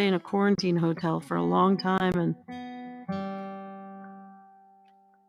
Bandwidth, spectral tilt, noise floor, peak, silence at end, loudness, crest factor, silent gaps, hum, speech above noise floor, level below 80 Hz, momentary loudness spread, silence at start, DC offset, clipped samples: 11 kHz; -7 dB/octave; -60 dBFS; -10 dBFS; 0.9 s; -27 LUFS; 18 dB; none; none; 34 dB; -64 dBFS; 19 LU; 0 s; under 0.1%; under 0.1%